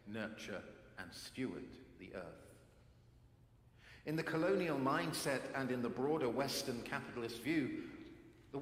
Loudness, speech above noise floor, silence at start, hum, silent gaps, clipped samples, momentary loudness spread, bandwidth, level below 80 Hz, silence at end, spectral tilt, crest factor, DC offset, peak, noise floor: -41 LUFS; 26 dB; 0.05 s; none; none; under 0.1%; 19 LU; 16.5 kHz; -70 dBFS; 0 s; -5 dB/octave; 20 dB; under 0.1%; -22 dBFS; -66 dBFS